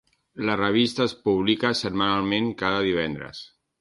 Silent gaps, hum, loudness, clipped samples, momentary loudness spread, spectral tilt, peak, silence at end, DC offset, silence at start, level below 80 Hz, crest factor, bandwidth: none; none; -24 LUFS; under 0.1%; 12 LU; -5.5 dB/octave; -6 dBFS; 0.35 s; under 0.1%; 0.35 s; -54 dBFS; 18 dB; 11.5 kHz